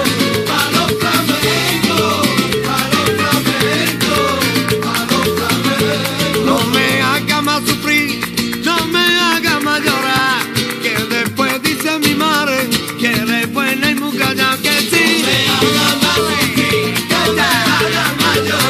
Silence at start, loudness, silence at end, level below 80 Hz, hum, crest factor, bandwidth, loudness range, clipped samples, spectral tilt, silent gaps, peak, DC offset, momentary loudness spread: 0 s; -13 LUFS; 0 s; -44 dBFS; none; 14 dB; 15.5 kHz; 2 LU; under 0.1%; -3.5 dB/octave; none; 0 dBFS; under 0.1%; 4 LU